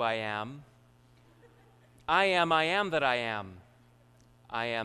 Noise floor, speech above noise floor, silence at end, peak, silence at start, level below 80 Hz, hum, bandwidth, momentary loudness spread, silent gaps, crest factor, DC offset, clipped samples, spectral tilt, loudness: -61 dBFS; 31 dB; 0 s; -10 dBFS; 0 s; -66 dBFS; none; 13 kHz; 18 LU; none; 22 dB; under 0.1%; under 0.1%; -4.5 dB/octave; -29 LUFS